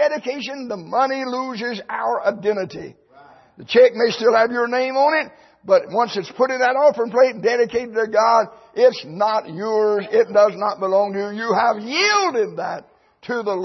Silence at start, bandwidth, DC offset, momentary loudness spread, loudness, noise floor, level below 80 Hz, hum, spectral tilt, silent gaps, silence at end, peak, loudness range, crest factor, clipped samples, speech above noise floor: 0 s; 6.2 kHz; under 0.1%; 12 LU; -19 LUFS; -48 dBFS; -66 dBFS; none; -4 dB/octave; none; 0 s; -4 dBFS; 3 LU; 16 dB; under 0.1%; 29 dB